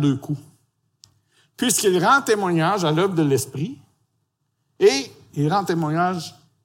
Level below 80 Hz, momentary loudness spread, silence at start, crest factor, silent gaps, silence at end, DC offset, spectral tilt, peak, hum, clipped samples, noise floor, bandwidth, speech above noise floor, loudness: -68 dBFS; 14 LU; 0 s; 18 dB; none; 0.35 s; under 0.1%; -4.5 dB/octave; -4 dBFS; none; under 0.1%; -72 dBFS; 16.5 kHz; 53 dB; -20 LUFS